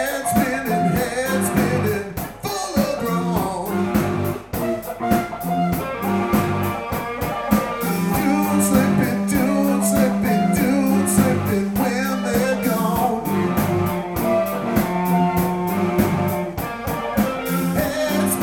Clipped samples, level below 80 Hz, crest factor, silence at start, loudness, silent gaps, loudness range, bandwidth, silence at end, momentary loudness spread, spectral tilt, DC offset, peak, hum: under 0.1%; -42 dBFS; 18 dB; 0 s; -20 LUFS; none; 4 LU; 18 kHz; 0 s; 7 LU; -5.5 dB/octave; under 0.1%; -2 dBFS; none